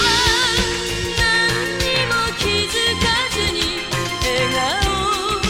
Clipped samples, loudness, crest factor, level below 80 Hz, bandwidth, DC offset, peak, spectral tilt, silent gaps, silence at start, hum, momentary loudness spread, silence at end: under 0.1%; -17 LUFS; 14 dB; -32 dBFS; 17.5 kHz; under 0.1%; -4 dBFS; -2.5 dB/octave; none; 0 s; none; 5 LU; 0 s